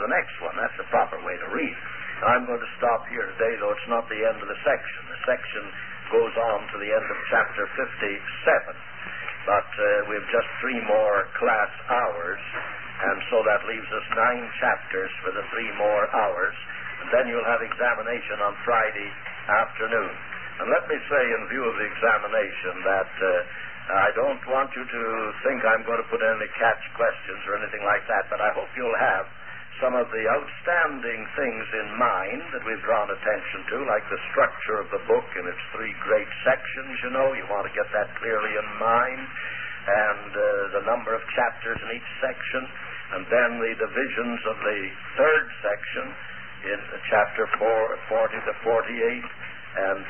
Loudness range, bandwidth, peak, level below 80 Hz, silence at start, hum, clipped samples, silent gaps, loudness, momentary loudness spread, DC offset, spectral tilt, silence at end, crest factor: 2 LU; 3.3 kHz; -8 dBFS; -60 dBFS; 0 s; none; under 0.1%; none; -25 LUFS; 9 LU; 0.9%; -8.5 dB/octave; 0 s; 18 dB